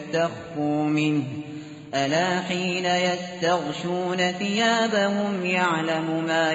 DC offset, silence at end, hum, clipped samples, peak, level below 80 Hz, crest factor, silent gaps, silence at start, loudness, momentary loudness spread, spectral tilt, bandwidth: under 0.1%; 0 s; none; under 0.1%; -10 dBFS; -66 dBFS; 14 dB; none; 0 s; -24 LUFS; 7 LU; -3.5 dB/octave; 8 kHz